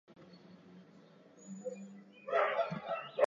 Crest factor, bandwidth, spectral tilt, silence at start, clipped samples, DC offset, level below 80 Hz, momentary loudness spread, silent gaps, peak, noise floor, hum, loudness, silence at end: 22 dB; 7.2 kHz; -3.5 dB/octave; 0.1 s; under 0.1%; under 0.1%; -84 dBFS; 25 LU; none; -16 dBFS; -60 dBFS; none; -37 LUFS; 0 s